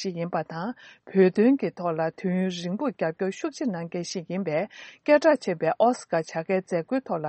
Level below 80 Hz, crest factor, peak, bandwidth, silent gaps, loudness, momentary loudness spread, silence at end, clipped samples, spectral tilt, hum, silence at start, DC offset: -74 dBFS; 18 dB; -8 dBFS; 8.4 kHz; none; -26 LUFS; 12 LU; 0 s; under 0.1%; -6.5 dB/octave; none; 0 s; under 0.1%